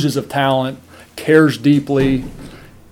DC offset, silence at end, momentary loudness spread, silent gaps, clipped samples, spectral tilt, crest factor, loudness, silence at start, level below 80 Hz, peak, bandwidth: under 0.1%; 0.35 s; 22 LU; none; under 0.1%; -6.5 dB/octave; 16 dB; -15 LUFS; 0 s; -40 dBFS; 0 dBFS; 16.5 kHz